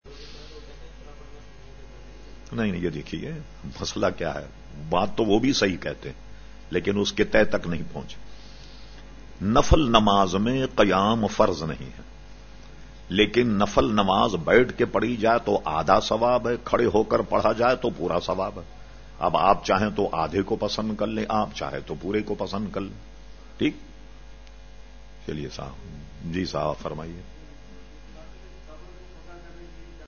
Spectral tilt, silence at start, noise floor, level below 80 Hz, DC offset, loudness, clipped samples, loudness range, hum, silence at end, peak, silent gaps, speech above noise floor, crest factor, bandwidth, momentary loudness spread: -5.5 dB/octave; 0 s; -45 dBFS; -42 dBFS; 0.5%; -24 LUFS; under 0.1%; 12 LU; none; 0 s; -2 dBFS; none; 22 dB; 24 dB; 7 kHz; 22 LU